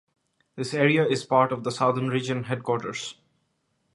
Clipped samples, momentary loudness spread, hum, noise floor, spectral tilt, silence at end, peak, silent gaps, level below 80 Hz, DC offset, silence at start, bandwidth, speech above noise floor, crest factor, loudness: under 0.1%; 12 LU; none; -73 dBFS; -5.5 dB/octave; 0.85 s; -6 dBFS; none; -70 dBFS; under 0.1%; 0.55 s; 11.5 kHz; 48 dB; 20 dB; -25 LUFS